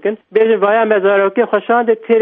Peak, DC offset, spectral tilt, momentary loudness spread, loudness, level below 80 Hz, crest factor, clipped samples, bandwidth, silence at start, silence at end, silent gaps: 0 dBFS; under 0.1%; -9 dB/octave; 3 LU; -13 LUFS; -68 dBFS; 12 dB; under 0.1%; 3.9 kHz; 0.05 s; 0 s; none